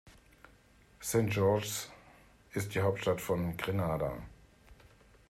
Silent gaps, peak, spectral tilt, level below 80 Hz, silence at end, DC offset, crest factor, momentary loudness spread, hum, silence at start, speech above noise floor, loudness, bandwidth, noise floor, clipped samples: none; -16 dBFS; -5.5 dB/octave; -58 dBFS; 0.55 s; under 0.1%; 18 dB; 13 LU; none; 0.05 s; 30 dB; -33 LUFS; 16 kHz; -62 dBFS; under 0.1%